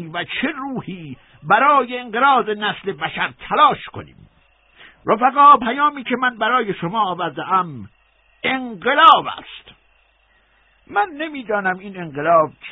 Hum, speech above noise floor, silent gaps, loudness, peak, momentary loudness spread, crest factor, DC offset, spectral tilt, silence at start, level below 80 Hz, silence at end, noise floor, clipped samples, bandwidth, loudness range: none; 40 dB; none; -17 LUFS; 0 dBFS; 19 LU; 18 dB; under 0.1%; -7 dB/octave; 0 s; -58 dBFS; 0 s; -58 dBFS; under 0.1%; 4 kHz; 4 LU